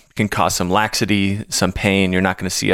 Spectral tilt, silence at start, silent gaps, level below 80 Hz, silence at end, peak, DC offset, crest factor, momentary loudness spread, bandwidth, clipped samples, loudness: -4 dB/octave; 0.15 s; none; -40 dBFS; 0 s; -2 dBFS; under 0.1%; 16 dB; 3 LU; 17 kHz; under 0.1%; -18 LUFS